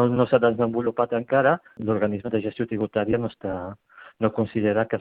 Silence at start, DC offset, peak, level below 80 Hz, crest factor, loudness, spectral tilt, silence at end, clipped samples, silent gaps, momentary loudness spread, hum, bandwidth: 0 s; under 0.1%; -4 dBFS; -58 dBFS; 18 dB; -24 LUFS; -11 dB/octave; 0 s; under 0.1%; none; 9 LU; none; 4.6 kHz